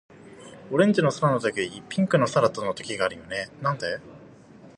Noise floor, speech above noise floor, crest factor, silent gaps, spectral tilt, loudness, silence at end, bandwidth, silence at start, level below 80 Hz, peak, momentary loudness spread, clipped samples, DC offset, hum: -49 dBFS; 25 dB; 20 dB; none; -6 dB/octave; -25 LUFS; 0.1 s; 11 kHz; 0.25 s; -62 dBFS; -6 dBFS; 12 LU; under 0.1%; under 0.1%; none